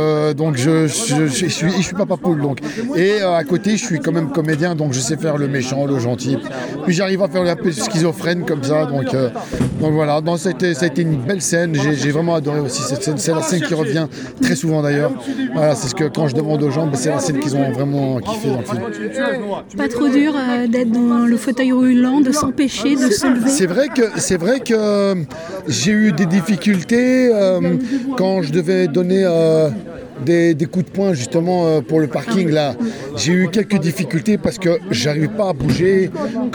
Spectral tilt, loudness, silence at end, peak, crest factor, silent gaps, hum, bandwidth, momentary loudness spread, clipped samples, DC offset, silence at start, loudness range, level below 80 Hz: -5.5 dB/octave; -17 LUFS; 0 s; -4 dBFS; 14 dB; none; none; 19.5 kHz; 6 LU; under 0.1%; under 0.1%; 0 s; 3 LU; -48 dBFS